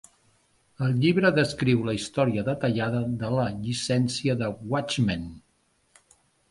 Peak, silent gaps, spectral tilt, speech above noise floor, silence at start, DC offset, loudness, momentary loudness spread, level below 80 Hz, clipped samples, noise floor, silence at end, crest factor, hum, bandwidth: -6 dBFS; none; -6 dB/octave; 43 dB; 0.8 s; under 0.1%; -26 LUFS; 8 LU; -54 dBFS; under 0.1%; -68 dBFS; 1.15 s; 20 dB; none; 11.5 kHz